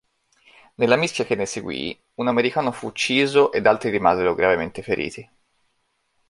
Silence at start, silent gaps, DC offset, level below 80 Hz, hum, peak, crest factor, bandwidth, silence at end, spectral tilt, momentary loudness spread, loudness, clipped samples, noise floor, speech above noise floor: 0.8 s; none; under 0.1%; -54 dBFS; none; -2 dBFS; 20 dB; 11.5 kHz; 1.05 s; -4.5 dB/octave; 10 LU; -21 LUFS; under 0.1%; -70 dBFS; 49 dB